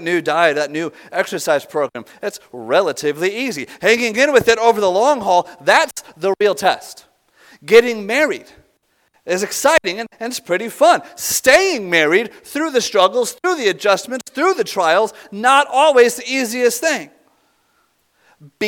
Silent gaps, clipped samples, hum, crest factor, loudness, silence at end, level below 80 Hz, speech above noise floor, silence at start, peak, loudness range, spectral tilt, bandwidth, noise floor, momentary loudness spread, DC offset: none; under 0.1%; none; 16 dB; -16 LUFS; 0 s; -58 dBFS; 46 dB; 0 s; 0 dBFS; 3 LU; -2.5 dB/octave; 19 kHz; -62 dBFS; 12 LU; under 0.1%